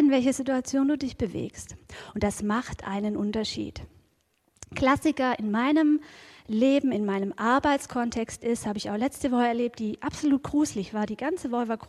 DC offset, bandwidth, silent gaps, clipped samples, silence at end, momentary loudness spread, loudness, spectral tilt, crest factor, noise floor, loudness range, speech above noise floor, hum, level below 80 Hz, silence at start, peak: under 0.1%; 13.5 kHz; none; under 0.1%; 0 s; 12 LU; -27 LUFS; -5 dB/octave; 18 dB; -70 dBFS; 5 LU; 43 dB; none; -52 dBFS; 0 s; -10 dBFS